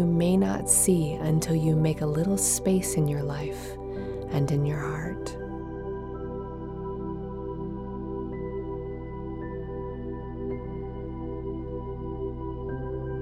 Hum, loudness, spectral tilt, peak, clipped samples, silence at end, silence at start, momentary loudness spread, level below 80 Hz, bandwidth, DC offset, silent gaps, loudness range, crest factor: 60 Hz at -70 dBFS; -29 LUFS; -5.5 dB/octave; -8 dBFS; under 0.1%; 0 s; 0 s; 13 LU; -42 dBFS; 16 kHz; under 0.1%; none; 11 LU; 20 dB